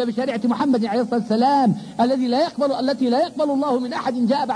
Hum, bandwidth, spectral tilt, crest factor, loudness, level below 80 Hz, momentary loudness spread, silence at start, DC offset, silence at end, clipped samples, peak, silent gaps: none; 10.5 kHz; -6.5 dB/octave; 12 dB; -20 LUFS; -64 dBFS; 4 LU; 0 s; under 0.1%; 0 s; under 0.1%; -8 dBFS; none